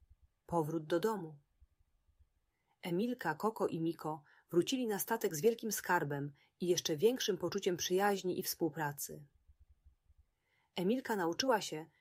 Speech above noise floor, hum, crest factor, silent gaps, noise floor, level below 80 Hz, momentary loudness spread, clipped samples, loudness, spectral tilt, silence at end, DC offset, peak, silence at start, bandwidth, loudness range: 44 dB; none; 20 dB; none; -80 dBFS; -74 dBFS; 11 LU; under 0.1%; -36 LUFS; -4 dB/octave; 0.15 s; under 0.1%; -18 dBFS; 0.5 s; 16 kHz; 5 LU